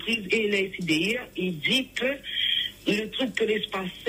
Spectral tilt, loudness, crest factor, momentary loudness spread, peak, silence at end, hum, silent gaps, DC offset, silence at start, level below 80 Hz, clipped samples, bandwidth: -4 dB/octave; -26 LUFS; 18 dB; 5 LU; -10 dBFS; 0 s; 50 Hz at -55 dBFS; none; under 0.1%; 0 s; -58 dBFS; under 0.1%; 16 kHz